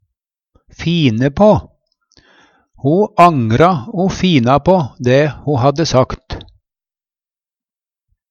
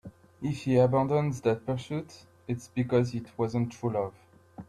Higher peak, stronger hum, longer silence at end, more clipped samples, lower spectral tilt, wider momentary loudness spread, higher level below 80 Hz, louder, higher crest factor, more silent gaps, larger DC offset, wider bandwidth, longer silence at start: first, 0 dBFS vs -12 dBFS; neither; first, 1.9 s vs 0.05 s; neither; second, -6.5 dB/octave vs -8 dB/octave; second, 10 LU vs 13 LU; first, -40 dBFS vs -60 dBFS; first, -13 LUFS vs -29 LUFS; about the same, 14 dB vs 18 dB; neither; neither; second, 9.6 kHz vs 12 kHz; first, 0.8 s vs 0.05 s